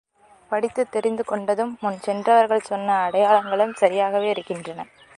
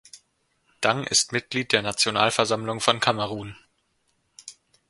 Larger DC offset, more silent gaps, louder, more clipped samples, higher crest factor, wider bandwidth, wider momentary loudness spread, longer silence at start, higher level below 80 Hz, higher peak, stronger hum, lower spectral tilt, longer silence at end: neither; neither; about the same, -21 LUFS vs -23 LUFS; neither; second, 18 dB vs 26 dB; about the same, 11.5 kHz vs 11.5 kHz; second, 10 LU vs 22 LU; first, 0.5 s vs 0.15 s; second, -68 dBFS vs -62 dBFS; about the same, -2 dBFS vs 0 dBFS; neither; first, -5 dB/octave vs -2.5 dB/octave; about the same, 0.35 s vs 0.4 s